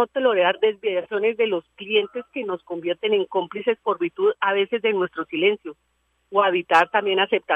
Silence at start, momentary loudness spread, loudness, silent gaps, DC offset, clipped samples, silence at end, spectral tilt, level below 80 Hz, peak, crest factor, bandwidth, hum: 0 s; 10 LU; -22 LUFS; none; under 0.1%; under 0.1%; 0 s; -5 dB/octave; -72 dBFS; -4 dBFS; 18 dB; 8.4 kHz; none